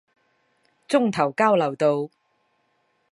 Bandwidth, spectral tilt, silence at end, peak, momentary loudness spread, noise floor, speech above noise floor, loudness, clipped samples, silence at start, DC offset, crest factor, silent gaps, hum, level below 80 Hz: 11.5 kHz; -6 dB/octave; 1.05 s; -4 dBFS; 7 LU; -69 dBFS; 48 dB; -22 LUFS; under 0.1%; 0.9 s; under 0.1%; 20 dB; none; none; -72 dBFS